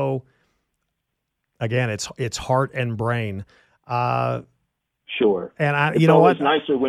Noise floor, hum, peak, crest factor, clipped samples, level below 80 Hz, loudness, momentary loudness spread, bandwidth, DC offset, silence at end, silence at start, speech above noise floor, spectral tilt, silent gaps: -78 dBFS; none; 0 dBFS; 20 dB; under 0.1%; -56 dBFS; -21 LUFS; 15 LU; 13 kHz; under 0.1%; 0 s; 0 s; 58 dB; -6 dB/octave; none